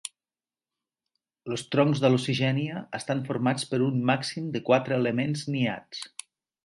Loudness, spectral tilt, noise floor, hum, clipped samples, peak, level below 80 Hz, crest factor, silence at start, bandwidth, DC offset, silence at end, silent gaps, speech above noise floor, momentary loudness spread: -27 LUFS; -6 dB/octave; under -90 dBFS; none; under 0.1%; -8 dBFS; -68 dBFS; 20 dB; 0.05 s; 11.5 kHz; under 0.1%; 0.6 s; none; over 64 dB; 14 LU